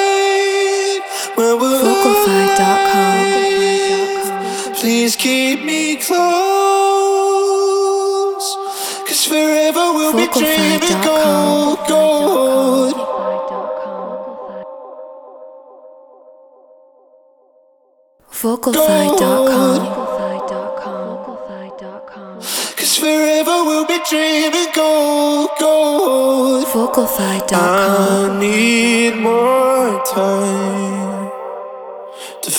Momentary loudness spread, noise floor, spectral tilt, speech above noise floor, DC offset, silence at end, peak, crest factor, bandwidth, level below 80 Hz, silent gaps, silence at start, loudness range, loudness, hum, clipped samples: 15 LU; -54 dBFS; -3.5 dB/octave; 41 dB; under 0.1%; 0 s; 0 dBFS; 16 dB; over 20 kHz; -56 dBFS; none; 0 s; 7 LU; -14 LUFS; none; under 0.1%